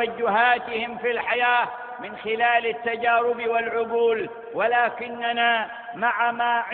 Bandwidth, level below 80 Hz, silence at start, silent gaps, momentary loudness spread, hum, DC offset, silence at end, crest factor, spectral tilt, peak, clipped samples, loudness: 4.4 kHz; -66 dBFS; 0 s; none; 8 LU; none; under 0.1%; 0 s; 16 dB; -7.5 dB/octave; -6 dBFS; under 0.1%; -23 LUFS